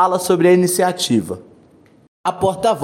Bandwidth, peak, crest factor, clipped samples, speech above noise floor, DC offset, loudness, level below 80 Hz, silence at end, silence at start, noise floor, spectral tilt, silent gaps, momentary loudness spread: 16.5 kHz; -2 dBFS; 14 dB; under 0.1%; 34 dB; under 0.1%; -16 LUFS; -54 dBFS; 0 s; 0 s; -49 dBFS; -4.5 dB/octave; 2.08-2.24 s; 12 LU